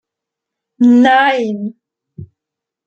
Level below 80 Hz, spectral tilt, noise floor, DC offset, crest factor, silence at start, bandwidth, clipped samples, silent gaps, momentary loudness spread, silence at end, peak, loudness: -60 dBFS; -6 dB/octave; -83 dBFS; under 0.1%; 14 dB; 0.8 s; 7.4 kHz; under 0.1%; none; 15 LU; 0.6 s; -2 dBFS; -11 LUFS